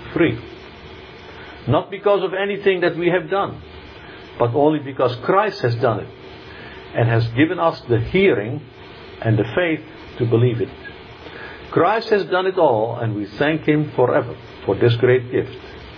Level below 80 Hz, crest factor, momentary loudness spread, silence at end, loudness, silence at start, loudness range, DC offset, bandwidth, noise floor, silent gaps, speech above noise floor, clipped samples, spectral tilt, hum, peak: -48 dBFS; 16 dB; 21 LU; 0 s; -19 LUFS; 0 s; 2 LU; under 0.1%; 5.4 kHz; -38 dBFS; none; 20 dB; under 0.1%; -9 dB/octave; none; -2 dBFS